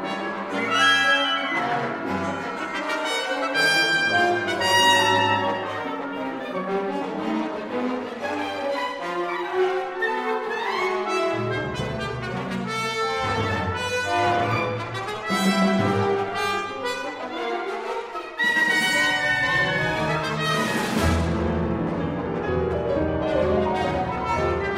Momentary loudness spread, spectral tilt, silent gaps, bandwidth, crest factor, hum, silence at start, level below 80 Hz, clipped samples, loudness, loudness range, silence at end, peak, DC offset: 10 LU; -4 dB/octave; none; 16 kHz; 18 dB; none; 0 s; -44 dBFS; under 0.1%; -23 LUFS; 6 LU; 0 s; -6 dBFS; under 0.1%